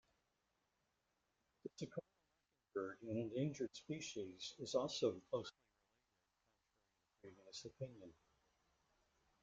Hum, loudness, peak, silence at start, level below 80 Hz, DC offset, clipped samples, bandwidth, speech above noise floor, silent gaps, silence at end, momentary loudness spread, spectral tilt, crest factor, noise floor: none; -47 LUFS; -26 dBFS; 1.65 s; -82 dBFS; under 0.1%; under 0.1%; 9 kHz; 41 dB; none; 1.3 s; 16 LU; -5 dB/octave; 24 dB; -87 dBFS